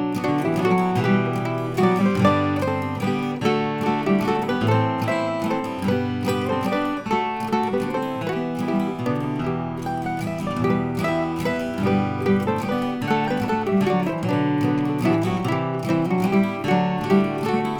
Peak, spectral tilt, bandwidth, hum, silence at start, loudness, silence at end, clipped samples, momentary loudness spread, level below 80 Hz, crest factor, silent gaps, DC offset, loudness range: -6 dBFS; -7 dB/octave; 19 kHz; none; 0 s; -22 LUFS; 0 s; under 0.1%; 5 LU; -52 dBFS; 16 dB; none; under 0.1%; 3 LU